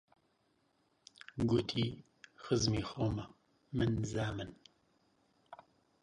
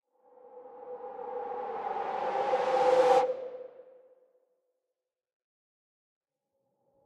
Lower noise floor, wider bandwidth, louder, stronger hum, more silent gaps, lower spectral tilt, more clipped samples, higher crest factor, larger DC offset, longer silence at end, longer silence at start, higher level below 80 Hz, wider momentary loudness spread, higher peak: second, -76 dBFS vs -88 dBFS; about the same, 10.5 kHz vs 10 kHz; second, -36 LUFS vs -29 LUFS; neither; neither; first, -5.5 dB/octave vs -4 dB/octave; neither; about the same, 18 dB vs 22 dB; neither; second, 0.5 s vs 3.15 s; first, 1.35 s vs 0.45 s; first, -58 dBFS vs -82 dBFS; about the same, 23 LU vs 22 LU; second, -20 dBFS vs -12 dBFS